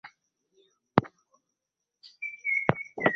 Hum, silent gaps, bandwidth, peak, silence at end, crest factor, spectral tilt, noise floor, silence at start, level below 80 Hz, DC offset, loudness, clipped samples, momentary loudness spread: none; none; 6.6 kHz; -2 dBFS; 0 s; 30 dB; -5 dB/octave; -86 dBFS; 0.05 s; -62 dBFS; under 0.1%; -29 LUFS; under 0.1%; 12 LU